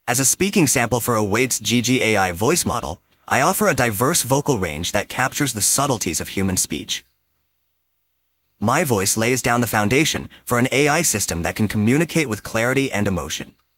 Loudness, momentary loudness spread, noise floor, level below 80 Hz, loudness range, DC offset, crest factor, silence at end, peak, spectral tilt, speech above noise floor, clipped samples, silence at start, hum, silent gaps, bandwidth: -19 LUFS; 6 LU; -70 dBFS; -48 dBFS; 4 LU; under 0.1%; 18 dB; 0.25 s; -2 dBFS; -3.5 dB/octave; 51 dB; under 0.1%; 0.05 s; none; none; 17 kHz